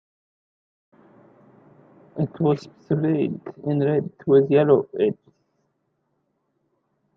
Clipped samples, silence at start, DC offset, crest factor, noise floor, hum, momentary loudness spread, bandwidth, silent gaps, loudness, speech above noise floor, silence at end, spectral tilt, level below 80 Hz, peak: under 0.1%; 2.15 s; under 0.1%; 20 dB; -72 dBFS; none; 12 LU; 6.2 kHz; none; -22 LUFS; 51 dB; 2.05 s; -10 dB/octave; -68 dBFS; -4 dBFS